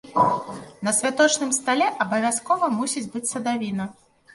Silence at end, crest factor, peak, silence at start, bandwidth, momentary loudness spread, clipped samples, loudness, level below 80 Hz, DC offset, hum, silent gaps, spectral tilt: 0.45 s; 18 dB; -4 dBFS; 0.05 s; 11.5 kHz; 10 LU; under 0.1%; -23 LUFS; -66 dBFS; under 0.1%; none; none; -3 dB/octave